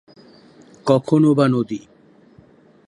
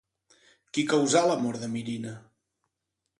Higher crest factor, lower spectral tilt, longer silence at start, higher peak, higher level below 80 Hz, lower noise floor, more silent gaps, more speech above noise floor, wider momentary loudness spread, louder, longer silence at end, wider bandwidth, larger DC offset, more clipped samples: about the same, 18 dB vs 20 dB; first, -8 dB/octave vs -4 dB/octave; about the same, 0.85 s vs 0.75 s; first, -2 dBFS vs -8 dBFS; first, -64 dBFS vs -72 dBFS; second, -50 dBFS vs -83 dBFS; neither; second, 34 dB vs 57 dB; about the same, 13 LU vs 15 LU; first, -18 LUFS vs -27 LUFS; about the same, 1.1 s vs 1 s; about the same, 11 kHz vs 11.5 kHz; neither; neither